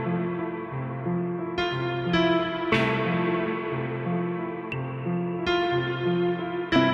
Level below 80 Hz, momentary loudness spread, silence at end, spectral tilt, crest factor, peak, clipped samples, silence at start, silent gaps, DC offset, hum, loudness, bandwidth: -54 dBFS; 8 LU; 0 s; -7.5 dB/octave; 16 dB; -10 dBFS; under 0.1%; 0 s; none; under 0.1%; none; -27 LUFS; 7.6 kHz